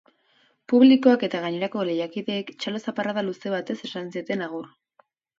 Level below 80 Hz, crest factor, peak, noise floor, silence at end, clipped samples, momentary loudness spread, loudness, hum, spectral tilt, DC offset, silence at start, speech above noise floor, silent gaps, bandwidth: -76 dBFS; 20 dB; -6 dBFS; -64 dBFS; 0.75 s; under 0.1%; 15 LU; -24 LUFS; none; -6.5 dB/octave; under 0.1%; 0.7 s; 41 dB; none; 7.6 kHz